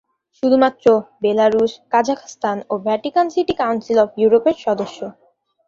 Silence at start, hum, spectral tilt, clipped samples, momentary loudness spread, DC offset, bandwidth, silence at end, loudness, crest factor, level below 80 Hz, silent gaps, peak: 0.45 s; none; -5.5 dB/octave; under 0.1%; 9 LU; under 0.1%; 7.4 kHz; 0.55 s; -18 LUFS; 16 dB; -58 dBFS; none; -2 dBFS